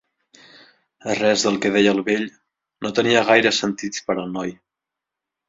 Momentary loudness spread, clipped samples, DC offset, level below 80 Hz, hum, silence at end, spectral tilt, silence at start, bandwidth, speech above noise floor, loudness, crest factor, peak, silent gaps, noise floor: 14 LU; under 0.1%; under 0.1%; -60 dBFS; none; 0.95 s; -3.5 dB/octave; 1.05 s; 7.8 kHz; 66 dB; -19 LUFS; 20 dB; -2 dBFS; none; -85 dBFS